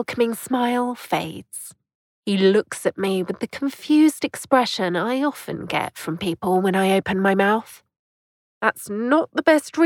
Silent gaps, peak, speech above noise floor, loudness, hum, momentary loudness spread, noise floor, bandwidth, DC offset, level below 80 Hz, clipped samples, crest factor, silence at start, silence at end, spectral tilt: 1.95-2.23 s, 7.99-8.61 s; -4 dBFS; over 69 dB; -21 LUFS; none; 10 LU; under -90 dBFS; 17.5 kHz; under 0.1%; -62 dBFS; under 0.1%; 18 dB; 0 s; 0 s; -5 dB/octave